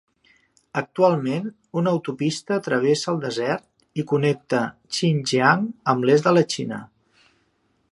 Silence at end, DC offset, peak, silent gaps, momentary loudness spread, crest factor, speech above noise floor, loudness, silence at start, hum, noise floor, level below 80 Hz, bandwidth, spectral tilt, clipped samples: 1.05 s; under 0.1%; -2 dBFS; none; 11 LU; 22 dB; 46 dB; -22 LUFS; 0.75 s; none; -67 dBFS; -68 dBFS; 11.5 kHz; -5.5 dB/octave; under 0.1%